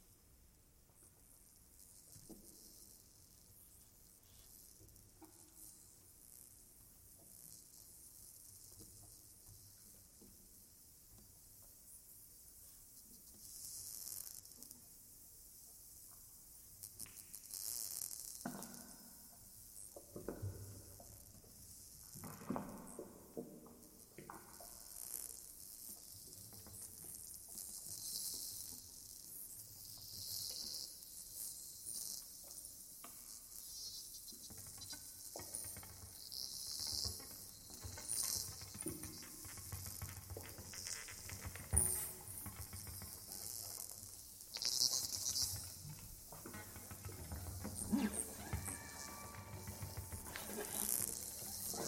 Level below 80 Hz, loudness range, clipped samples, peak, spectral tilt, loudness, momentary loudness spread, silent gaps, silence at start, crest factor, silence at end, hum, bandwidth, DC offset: -64 dBFS; 17 LU; under 0.1%; -12 dBFS; -2 dB/octave; -46 LUFS; 20 LU; none; 0 s; 38 dB; 0 s; none; 16.5 kHz; under 0.1%